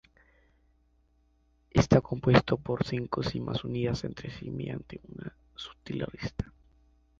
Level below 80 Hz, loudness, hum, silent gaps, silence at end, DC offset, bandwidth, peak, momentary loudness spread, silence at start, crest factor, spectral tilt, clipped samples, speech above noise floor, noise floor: -50 dBFS; -30 LUFS; none; none; 0.7 s; under 0.1%; 7.6 kHz; -6 dBFS; 20 LU; 1.75 s; 26 dB; -7 dB/octave; under 0.1%; 38 dB; -68 dBFS